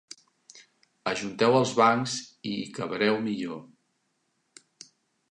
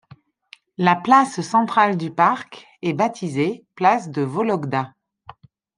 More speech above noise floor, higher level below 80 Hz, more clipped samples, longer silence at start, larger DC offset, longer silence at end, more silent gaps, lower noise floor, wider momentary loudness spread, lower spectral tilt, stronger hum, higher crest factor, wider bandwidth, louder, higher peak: first, 49 dB vs 31 dB; about the same, -72 dBFS vs -68 dBFS; neither; second, 0.55 s vs 0.8 s; neither; first, 1.65 s vs 0.9 s; neither; first, -75 dBFS vs -51 dBFS; first, 15 LU vs 12 LU; second, -4.5 dB/octave vs -6 dB/octave; neither; about the same, 22 dB vs 20 dB; about the same, 11 kHz vs 10.5 kHz; second, -27 LUFS vs -20 LUFS; second, -8 dBFS vs -2 dBFS